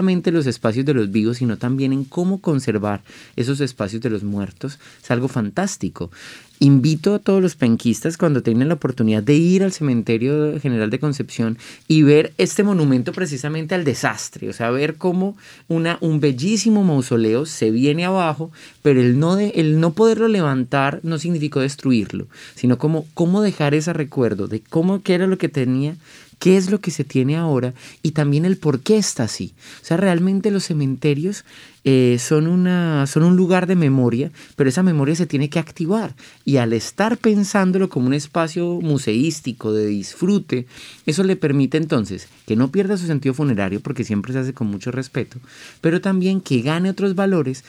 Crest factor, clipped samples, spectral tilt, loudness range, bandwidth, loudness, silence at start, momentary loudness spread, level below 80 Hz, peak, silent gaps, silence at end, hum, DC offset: 16 dB; under 0.1%; -6.5 dB/octave; 4 LU; 14 kHz; -19 LUFS; 0 s; 10 LU; -60 dBFS; -2 dBFS; none; 0.1 s; none; under 0.1%